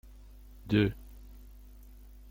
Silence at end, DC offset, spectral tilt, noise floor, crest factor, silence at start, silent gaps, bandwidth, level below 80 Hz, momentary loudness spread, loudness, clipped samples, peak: 0.9 s; under 0.1%; -8 dB/octave; -51 dBFS; 22 dB; 0.65 s; none; 16.5 kHz; -50 dBFS; 26 LU; -30 LUFS; under 0.1%; -14 dBFS